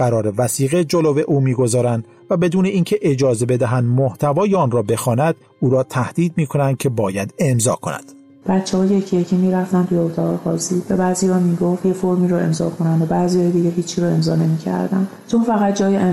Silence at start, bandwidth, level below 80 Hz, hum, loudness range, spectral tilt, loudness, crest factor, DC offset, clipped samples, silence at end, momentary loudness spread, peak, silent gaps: 0 s; 15.5 kHz; -54 dBFS; none; 2 LU; -6.5 dB/octave; -18 LUFS; 12 dB; under 0.1%; under 0.1%; 0 s; 4 LU; -6 dBFS; none